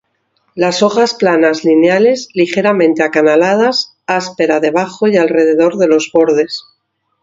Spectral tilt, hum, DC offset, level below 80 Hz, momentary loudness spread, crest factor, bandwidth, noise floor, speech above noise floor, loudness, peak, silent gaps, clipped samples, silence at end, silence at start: -5 dB/octave; none; under 0.1%; -60 dBFS; 7 LU; 12 dB; 7.8 kHz; -65 dBFS; 54 dB; -12 LUFS; 0 dBFS; none; under 0.1%; 0.6 s; 0.55 s